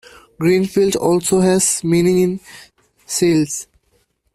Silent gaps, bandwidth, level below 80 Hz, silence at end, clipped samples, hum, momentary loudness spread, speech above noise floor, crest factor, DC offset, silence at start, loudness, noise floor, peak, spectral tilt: none; 15 kHz; -50 dBFS; 0.7 s; under 0.1%; none; 9 LU; 47 dB; 16 dB; under 0.1%; 0.4 s; -16 LUFS; -62 dBFS; -2 dBFS; -5 dB/octave